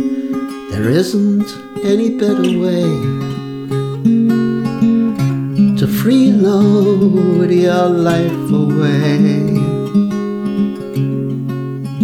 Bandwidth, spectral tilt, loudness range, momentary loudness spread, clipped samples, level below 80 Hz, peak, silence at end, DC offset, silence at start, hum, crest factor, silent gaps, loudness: 16 kHz; -7.5 dB/octave; 4 LU; 10 LU; under 0.1%; -50 dBFS; -2 dBFS; 0 s; under 0.1%; 0 s; none; 12 dB; none; -14 LUFS